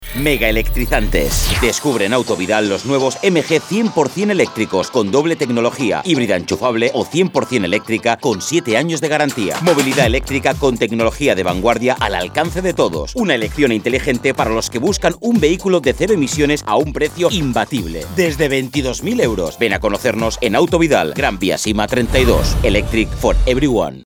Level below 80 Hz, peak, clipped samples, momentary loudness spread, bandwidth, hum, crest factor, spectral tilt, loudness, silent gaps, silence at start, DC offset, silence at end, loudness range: -26 dBFS; 0 dBFS; under 0.1%; 3 LU; over 20 kHz; none; 16 dB; -4.5 dB/octave; -16 LUFS; none; 0 s; under 0.1%; 0.05 s; 1 LU